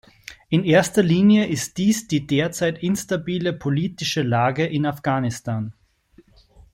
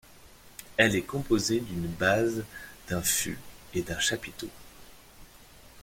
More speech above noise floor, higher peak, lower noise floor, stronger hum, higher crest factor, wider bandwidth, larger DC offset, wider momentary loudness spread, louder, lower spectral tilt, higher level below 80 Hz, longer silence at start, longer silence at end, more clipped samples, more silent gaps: first, 35 dB vs 24 dB; about the same, -4 dBFS vs -6 dBFS; about the same, -55 dBFS vs -53 dBFS; neither; second, 18 dB vs 24 dB; about the same, 16.5 kHz vs 16.5 kHz; neither; second, 10 LU vs 18 LU; first, -21 LUFS vs -28 LUFS; first, -5.5 dB/octave vs -3.5 dB/octave; about the same, -54 dBFS vs -52 dBFS; first, 0.3 s vs 0.1 s; first, 1 s vs 0 s; neither; neither